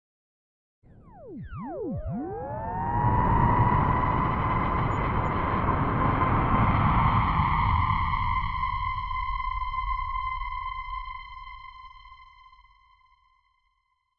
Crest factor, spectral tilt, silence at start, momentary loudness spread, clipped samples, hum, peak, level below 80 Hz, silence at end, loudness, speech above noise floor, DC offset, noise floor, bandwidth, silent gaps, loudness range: 18 dB; -9.5 dB/octave; 1.15 s; 17 LU; under 0.1%; none; -10 dBFS; -36 dBFS; 1.95 s; -26 LUFS; 41 dB; under 0.1%; -74 dBFS; 5.4 kHz; none; 12 LU